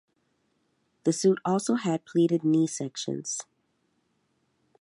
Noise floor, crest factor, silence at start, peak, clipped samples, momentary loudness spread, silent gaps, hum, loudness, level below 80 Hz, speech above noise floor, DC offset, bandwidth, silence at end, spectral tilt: -73 dBFS; 18 dB; 1.05 s; -12 dBFS; under 0.1%; 9 LU; none; none; -27 LUFS; -80 dBFS; 47 dB; under 0.1%; 11.5 kHz; 1.4 s; -5.5 dB/octave